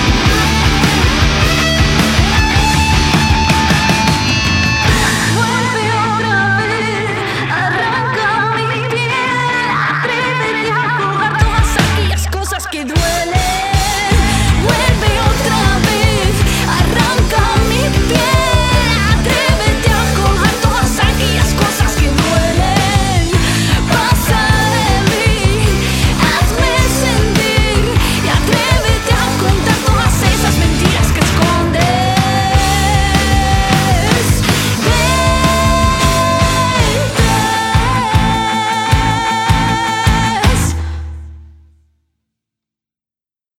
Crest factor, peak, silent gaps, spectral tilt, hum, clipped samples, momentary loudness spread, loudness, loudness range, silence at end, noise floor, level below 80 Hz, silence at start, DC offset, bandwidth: 12 dB; 0 dBFS; none; -4.5 dB/octave; none; under 0.1%; 3 LU; -12 LUFS; 3 LU; 2.1 s; under -90 dBFS; -20 dBFS; 0 s; under 0.1%; 17 kHz